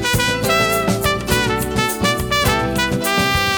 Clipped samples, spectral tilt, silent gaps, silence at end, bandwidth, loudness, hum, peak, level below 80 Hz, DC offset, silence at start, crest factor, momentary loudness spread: under 0.1%; -3.5 dB/octave; none; 0 s; over 20 kHz; -17 LUFS; none; -2 dBFS; -32 dBFS; under 0.1%; 0 s; 16 dB; 3 LU